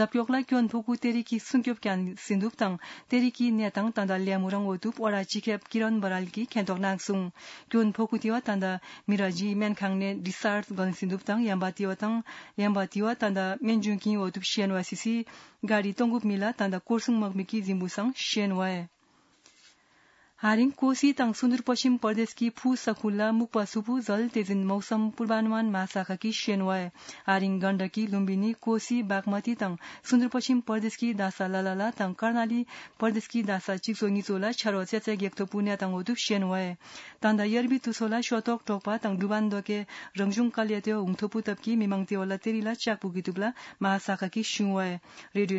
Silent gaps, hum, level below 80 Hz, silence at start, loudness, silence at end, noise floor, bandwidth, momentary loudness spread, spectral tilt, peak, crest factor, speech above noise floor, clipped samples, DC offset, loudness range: none; none; -78 dBFS; 0 s; -29 LUFS; 0 s; -65 dBFS; 8 kHz; 6 LU; -5.5 dB/octave; -10 dBFS; 18 dB; 37 dB; under 0.1%; under 0.1%; 2 LU